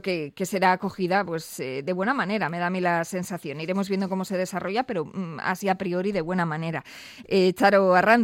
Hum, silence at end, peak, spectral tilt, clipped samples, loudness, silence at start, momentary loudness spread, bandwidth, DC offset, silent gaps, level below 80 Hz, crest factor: none; 0 s; -6 dBFS; -5.5 dB/octave; under 0.1%; -25 LUFS; 0.05 s; 12 LU; 16.5 kHz; under 0.1%; none; -64 dBFS; 18 dB